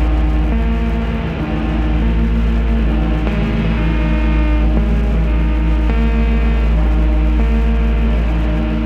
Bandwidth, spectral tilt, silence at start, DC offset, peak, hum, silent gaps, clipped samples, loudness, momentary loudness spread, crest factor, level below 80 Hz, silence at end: 4.8 kHz; -8.5 dB/octave; 0 s; under 0.1%; -4 dBFS; none; none; under 0.1%; -17 LUFS; 2 LU; 10 dB; -14 dBFS; 0 s